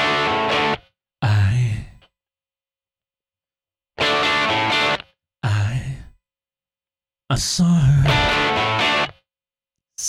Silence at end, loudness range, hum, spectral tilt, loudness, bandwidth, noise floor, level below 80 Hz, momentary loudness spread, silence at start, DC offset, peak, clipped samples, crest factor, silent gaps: 0 s; 5 LU; none; -4.5 dB/octave; -19 LUFS; 14 kHz; under -90 dBFS; -40 dBFS; 12 LU; 0 s; under 0.1%; -6 dBFS; under 0.1%; 14 dB; none